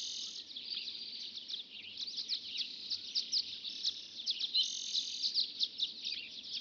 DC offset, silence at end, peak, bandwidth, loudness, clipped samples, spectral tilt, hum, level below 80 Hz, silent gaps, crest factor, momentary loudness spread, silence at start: under 0.1%; 0 s; -20 dBFS; 8.2 kHz; -36 LUFS; under 0.1%; 2 dB/octave; none; -88 dBFS; none; 20 dB; 10 LU; 0 s